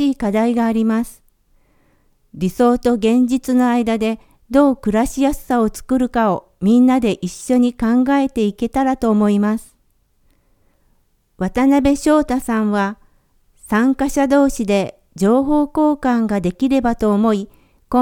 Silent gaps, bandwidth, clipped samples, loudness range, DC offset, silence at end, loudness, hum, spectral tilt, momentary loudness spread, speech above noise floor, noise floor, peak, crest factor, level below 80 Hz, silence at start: none; 16 kHz; under 0.1%; 3 LU; under 0.1%; 0 s; -17 LUFS; none; -6 dB/octave; 6 LU; 44 dB; -60 dBFS; 0 dBFS; 16 dB; -40 dBFS; 0 s